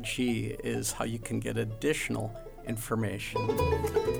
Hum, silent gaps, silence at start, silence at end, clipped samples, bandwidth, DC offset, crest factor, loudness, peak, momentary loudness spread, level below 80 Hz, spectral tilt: none; none; 0 s; 0 s; under 0.1%; over 20 kHz; under 0.1%; 16 dB; -32 LUFS; -14 dBFS; 8 LU; -46 dBFS; -5 dB/octave